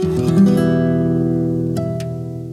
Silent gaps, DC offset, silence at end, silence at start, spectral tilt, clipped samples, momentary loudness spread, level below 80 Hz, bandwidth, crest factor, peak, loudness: none; under 0.1%; 0 s; 0 s; -8.5 dB/octave; under 0.1%; 11 LU; -46 dBFS; 13.5 kHz; 14 dB; -4 dBFS; -17 LUFS